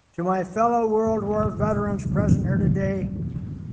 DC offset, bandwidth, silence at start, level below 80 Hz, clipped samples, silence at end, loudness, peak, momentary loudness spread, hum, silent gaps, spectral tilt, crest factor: under 0.1%; 8.8 kHz; 0.2 s; -38 dBFS; under 0.1%; 0 s; -23 LUFS; -6 dBFS; 8 LU; none; none; -9 dB/octave; 16 dB